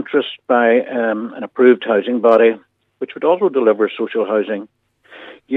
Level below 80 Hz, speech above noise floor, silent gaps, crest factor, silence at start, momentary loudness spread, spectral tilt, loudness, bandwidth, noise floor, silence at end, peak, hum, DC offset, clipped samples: -74 dBFS; 25 dB; none; 16 dB; 0 s; 13 LU; -7.5 dB/octave; -16 LUFS; 4.1 kHz; -41 dBFS; 0 s; 0 dBFS; none; under 0.1%; under 0.1%